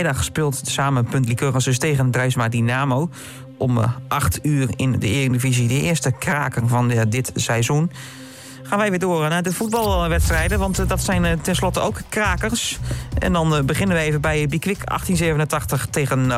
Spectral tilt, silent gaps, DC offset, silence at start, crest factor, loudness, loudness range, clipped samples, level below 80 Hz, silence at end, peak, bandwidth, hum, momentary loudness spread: -5 dB/octave; none; under 0.1%; 0 s; 10 dB; -20 LUFS; 1 LU; under 0.1%; -32 dBFS; 0 s; -8 dBFS; 16 kHz; none; 5 LU